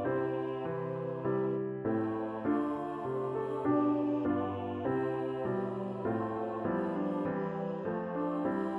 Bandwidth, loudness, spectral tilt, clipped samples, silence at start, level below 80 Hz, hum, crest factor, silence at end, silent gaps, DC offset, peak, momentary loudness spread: 4.4 kHz; -34 LUFS; -9.5 dB/octave; under 0.1%; 0 s; -68 dBFS; none; 14 dB; 0 s; none; under 0.1%; -20 dBFS; 5 LU